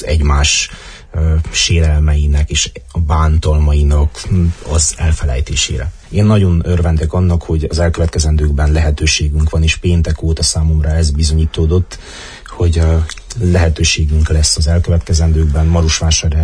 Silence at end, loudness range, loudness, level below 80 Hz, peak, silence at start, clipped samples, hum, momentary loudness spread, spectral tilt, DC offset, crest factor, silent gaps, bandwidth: 0 s; 2 LU; -13 LUFS; -16 dBFS; 0 dBFS; 0 s; under 0.1%; none; 5 LU; -4.5 dB/octave; under 0.1%; 12 dB; none; 10.5 kHz